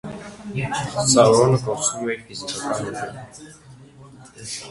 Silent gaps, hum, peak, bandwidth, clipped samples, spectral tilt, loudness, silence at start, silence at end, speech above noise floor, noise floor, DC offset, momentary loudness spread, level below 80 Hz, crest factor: none; none; 0 dBFS; 11.5 kHz; under 0.1%; -4 dB/octave; -20 LUFS; 0.05 s; 0 s; 24 dB; -45 dBFS; under 0.1%; 22 LU; -52 dBFS; 22 dB